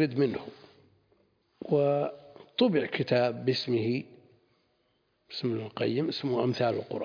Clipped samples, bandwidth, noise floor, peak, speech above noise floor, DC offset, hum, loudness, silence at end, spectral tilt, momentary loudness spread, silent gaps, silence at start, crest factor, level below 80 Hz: under 0.1%; 5.4 kHz; -73 dBFS; -12 dBFS; 45 dB; under 0.1%; none; -29 LUFS; 0 s; -7.5 dB/octave; 13 LU; none; 0 s; 18 dB; -74 dBFS